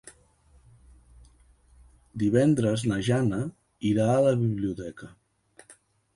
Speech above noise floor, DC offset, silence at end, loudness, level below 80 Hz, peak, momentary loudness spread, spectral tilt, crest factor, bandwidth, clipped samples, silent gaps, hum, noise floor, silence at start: 36 dB; under 0.1%; 0.45 s; -26 LUFS; -56 dBFS; -10 dBFS; 16 LU; -7 dB/octave; 18 dB; 11.5 kHz; under 0.1%; none; none; -60 dBFS; 0.05 s